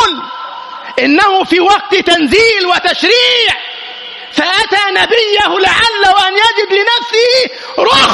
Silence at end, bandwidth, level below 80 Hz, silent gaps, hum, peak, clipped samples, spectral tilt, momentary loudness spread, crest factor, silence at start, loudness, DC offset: 0 s; 12 kHz; -44 dBFS; none; none; 0 dBFS; 0.1%; -2 dB/octave; 13 LU; 10 dB; 0 s; -9 LUFS; under 0.1%